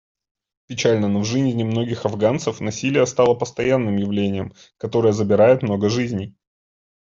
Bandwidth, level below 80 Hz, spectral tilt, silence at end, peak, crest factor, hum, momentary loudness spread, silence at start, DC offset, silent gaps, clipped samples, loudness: 7.6 kHz; -56 dBFS; -6 dB/octave; 0.75 s; -4 dBFS; 16 dB; none; 11 LU; 0.7 s; under 0.1%; none; under 0.1%; -20 LUFS